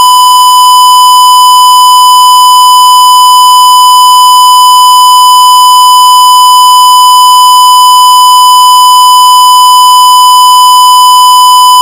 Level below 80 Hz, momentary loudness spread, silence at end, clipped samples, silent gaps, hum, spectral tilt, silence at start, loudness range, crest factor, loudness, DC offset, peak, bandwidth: -60 dBFS; 0 LU; 0 s; 20%; none; none; 3.5 dB/octave; 0 s; 0 LU; 0 dB; 0 LUFS; 0.3%; 0 dBFS; over 20 kHz